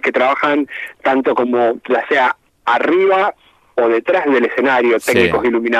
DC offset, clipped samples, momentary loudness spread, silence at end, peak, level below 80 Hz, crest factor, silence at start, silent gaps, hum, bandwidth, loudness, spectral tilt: under 0.1%; under 0.1%; 6 LU; 0 s; 0 dBFS; -52 dBFS; 14 dB; 0.05 s; none; none; 13.5 kHz; -15 LUFS; -5 dB/octave